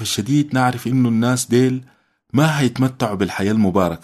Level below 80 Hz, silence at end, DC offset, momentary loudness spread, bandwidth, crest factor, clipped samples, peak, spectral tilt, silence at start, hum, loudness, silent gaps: -52 dBFS; 0.05 s; under 0.1%; 4 LU; 13.5 kHz; 16 dB; under 0.1%; -2 dBFS; -5.5 dB/octave; 0 s; none; -18 LUFS; none